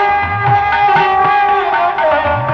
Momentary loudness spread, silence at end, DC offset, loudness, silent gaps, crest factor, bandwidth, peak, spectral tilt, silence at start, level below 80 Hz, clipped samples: 3 LU; 0 s; under 0.1%; -12 LUFS; none; 10 dB; 6.4 kHz; -2 dBFS; -6.5 dB/octave; 0 s; -36 dBFS; under 0.1%